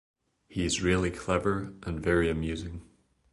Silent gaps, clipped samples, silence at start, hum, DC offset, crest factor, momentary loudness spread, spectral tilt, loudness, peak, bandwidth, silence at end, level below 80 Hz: none; under 0.1%; 0.5 s; none; under 0.1%; 18 dB; 12 LU; -5 dB/octave; -29 LUFS; -12 dBFS; 11.5 kHz; 0.5 s; -44 dBFS